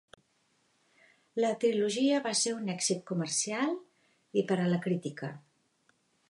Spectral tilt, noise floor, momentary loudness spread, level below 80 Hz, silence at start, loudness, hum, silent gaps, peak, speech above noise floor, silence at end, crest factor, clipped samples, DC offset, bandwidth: -4 dB/octave; -73 dBFS; 11 LU; -82 dBFS; 1.35 s; -31 LUFS; none; none; -16 dBFS; 42 dB; 0.9 s; 18 dB; under 0.1%; under 0.1%; 11.5 kHz